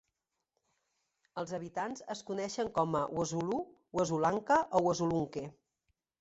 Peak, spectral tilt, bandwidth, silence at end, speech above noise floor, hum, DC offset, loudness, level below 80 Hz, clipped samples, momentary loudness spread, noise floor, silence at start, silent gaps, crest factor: -14 dBFS; -5.5 dB/octave; 8 kHz; 0.7 s; 53 dB; none; under 0.1%; -34 LUFS; -68 dBFS; under 0.1%; 12 LU; -86 dBFS; 1.35 s; none; 20 dB